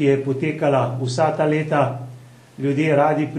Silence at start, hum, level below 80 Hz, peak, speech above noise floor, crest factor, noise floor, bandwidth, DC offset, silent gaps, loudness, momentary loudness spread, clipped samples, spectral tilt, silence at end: 0 s; none; -64 dBFS; -4 dBFS; 23 dB; 16 dB; -42 dBFS; 11.5 kHz; under 0.1%; none; -20 LUFS; 7 LU; under 0.1%; -7 dB/octave; 0 s